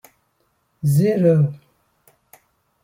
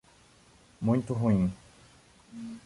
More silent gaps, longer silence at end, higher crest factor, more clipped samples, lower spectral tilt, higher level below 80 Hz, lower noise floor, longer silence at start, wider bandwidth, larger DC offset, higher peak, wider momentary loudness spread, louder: neither; first, 1.25 s vs 0.05 s; about the same, 18 dB vs 18 dB; neither; about the same, -8.5 dB/octave vs -9 dB/octave; second, -60 dBFS vs -54 dBFS; first, -67 dBFS vs -59 dBFS; about the same, 0.85 s vs 0.8 s; first, 16.5 kHz vs 11.5 kHz; neither; first, -4 dBFS vs -14 dBFS; second, 7 LU vs 21 LU; first, -18 LUFS vs -29 LUFS